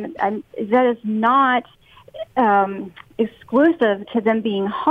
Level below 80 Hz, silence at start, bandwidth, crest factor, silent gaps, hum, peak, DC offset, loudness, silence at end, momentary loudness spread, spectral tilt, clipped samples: -60 dBFS; 0 s; 4.8 kHz; 14 dB; none; none; -6 dBFS; under 0.1%; -19 LUFS; 0 s; 10 LU; -8 dB/octave; under 0.1%